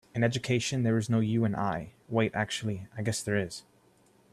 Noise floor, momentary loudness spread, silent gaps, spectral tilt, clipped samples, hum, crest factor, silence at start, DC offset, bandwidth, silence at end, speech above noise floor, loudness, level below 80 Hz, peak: -63 dBFS; 8 LU; none; -5.5 dB/octave; under 0.1%; none; 18 dB; 0.15 s; under 0.1%; 13 kHz; 0.7 s; 34 dB; -30 LUFS; -62 dBFS; -12 dBFS